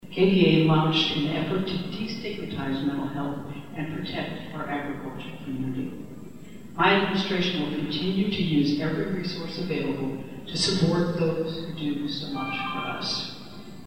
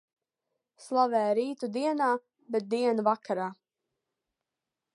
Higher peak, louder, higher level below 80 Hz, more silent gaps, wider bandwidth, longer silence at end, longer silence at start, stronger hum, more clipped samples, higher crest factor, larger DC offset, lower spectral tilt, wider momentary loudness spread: first, -6 dBFS vs -12 dBFS; first, -26 LUFS vs -29 LUFS; first, -54 dBFS vs -86 dBFS; neither; first, 16 kHz vs 11.5 kHz; second, 0 s vs 1.4 s; second, 0 s vs 0.8 s; neither; neither; about the same, 20 dB vs 18 dB; first, 0.7% vs under 0.1%; about the same, -6 dB/octave vs -5.5 dB/octave; first, 15 LU vs 8 LU